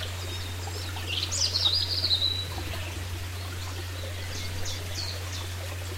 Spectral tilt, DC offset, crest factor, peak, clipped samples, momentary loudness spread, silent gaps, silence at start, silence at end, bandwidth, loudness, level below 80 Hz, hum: -2.5 dB/octave; under 0.1%; 20 dB; -12 dBFS; under 0.1%; 12 LU; none; 0 s; 0 s; 16 kHz; -29 LUFS; -46 dBFS; none